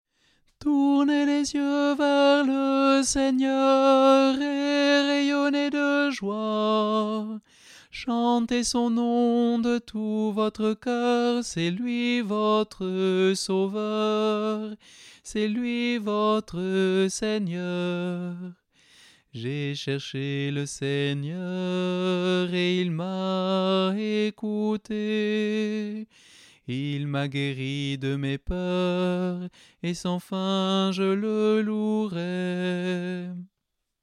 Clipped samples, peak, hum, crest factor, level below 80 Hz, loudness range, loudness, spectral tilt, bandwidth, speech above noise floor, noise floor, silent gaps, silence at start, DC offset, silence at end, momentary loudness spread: under 0.1%; -8 dBFS; none; 18 dB; -54 dBFS; 8 LU; -25 LUFS; -5.5 dB/octave; 12 kHz; 56 dB; -81 dBFS; none; 0.6 s; under 0.1%; 0.55 s; 10 LU